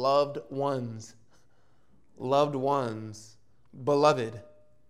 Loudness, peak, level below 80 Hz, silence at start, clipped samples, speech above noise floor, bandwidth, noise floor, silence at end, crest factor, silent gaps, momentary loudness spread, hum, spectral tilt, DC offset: -28 LUFS; -8 dBFS; -72 dBFS; 0 s; under 0.1%; 40 dB; 12 kHz; -67 dBFS; 0.45 s; 20 dB; none; 21 LU; none; -6 dB/octave; 0.2%